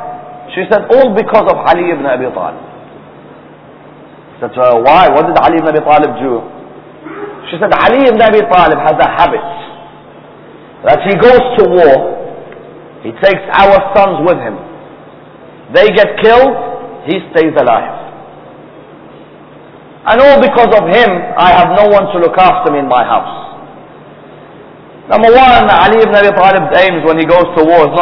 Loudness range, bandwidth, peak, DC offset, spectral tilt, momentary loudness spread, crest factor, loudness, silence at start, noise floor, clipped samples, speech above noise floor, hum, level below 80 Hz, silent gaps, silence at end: 5 LU; 5.4 kHz; 0 dBFS; under 0.1%; -7.5 dB/octave; 18 LU; 10 dB; -8 LUFS; 0 s; -35 dBFS; 3%; 27 dB; none; -38 dBFS; none; 0 s